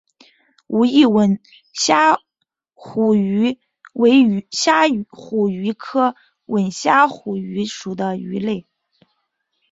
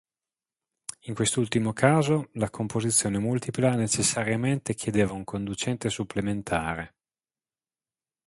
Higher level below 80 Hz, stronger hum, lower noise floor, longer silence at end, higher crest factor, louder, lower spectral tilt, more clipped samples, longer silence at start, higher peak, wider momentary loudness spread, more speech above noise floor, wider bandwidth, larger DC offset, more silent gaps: second, -62 dBFS vs -54 dBFS; neither; second, -76 dBFS vs under -90 dBFS; second, 1.1 s vs 1.4 s; second, 16 dB vs 22 dB; first, -18 LUFS vs -26 LUFS; about the same, -4.5 dB/octave vs -4.5 dB/octave; neither; second, 0.7 s vs 0.9 s; about the same, -2 dBFS vs -4 dBFS; about the same, 12 LU vs 10 LU; second, 59 dB vs over 64 dB; second, 8 kHz vs 11.5 kHz; neither; neither